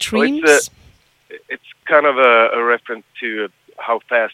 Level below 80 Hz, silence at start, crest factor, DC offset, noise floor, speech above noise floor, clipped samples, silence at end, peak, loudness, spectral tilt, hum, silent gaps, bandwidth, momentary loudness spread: -58 dBFS; 0 s; 16 dB; under 0.1%; -51 dBFS; 35 dB; under 0.1%; 0 s; 0 dBFS; -15 LUFS; -2.5 dB/octave; none; none; 15.5 kHz; 19 LU